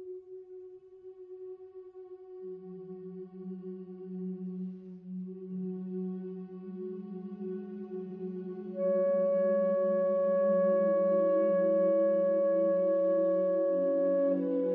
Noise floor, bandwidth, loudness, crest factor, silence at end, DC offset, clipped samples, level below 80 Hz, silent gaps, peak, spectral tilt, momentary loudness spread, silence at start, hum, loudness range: -51 dBFS; 3 kHz; -30 LUFS; 12 dB; 0 s; under 0.1%; under 0.1%; -84 dBFS; none; -18 dBFS; -12 dB/octave; 20 LU; 0 s; none; 18 LU